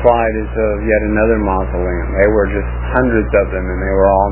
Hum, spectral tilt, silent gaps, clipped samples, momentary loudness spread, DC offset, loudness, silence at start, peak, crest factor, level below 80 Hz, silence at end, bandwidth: 60 Hz at -20 dBFS; -11.5 dB/octave; none; under 0.1%; 6 LU; under 0.1%; -15 LUFS; 0 s; 0 dBFS; 14 dB; -22 dBFS; 0 s; 3.1 kHz